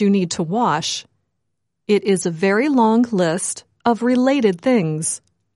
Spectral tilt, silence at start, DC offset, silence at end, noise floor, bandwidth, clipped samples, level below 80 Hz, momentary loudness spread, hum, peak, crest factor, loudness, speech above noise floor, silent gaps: -5 dB/octave; 0 s; under 0.1%; 0.4 s; -77 dBFS; 11.5 kHz; under 0.1%; -64 dBFS; 8 LU; none; -4 dBFS; 14 dB; -18 LUFS; 60 dB; none